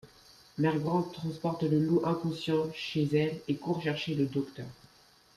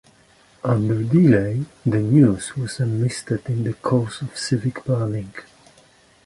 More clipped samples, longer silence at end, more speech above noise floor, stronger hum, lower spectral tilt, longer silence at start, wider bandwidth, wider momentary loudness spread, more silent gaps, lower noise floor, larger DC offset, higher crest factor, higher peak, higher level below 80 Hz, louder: neither; second, 0.65 s vs 0.85 s; about the same, 31 dB vs 34 dB; neither; about the same, -7.5 dB/octave vs -7 dB/octave; second, 0.05 s vs 0.65 s; first, 13.5 kHz vs 11.5 kHz; second, 8 LU vs 12 LU; neither; first, -61 dBFS vs -54 dBFS; neither; about the same, 16 dB vs 18 dB; second, -16 dBFS vs -4 dBFS; second, -66 dBFS vs -50 dBFS; second, -31 LUFS vs -21 LUFS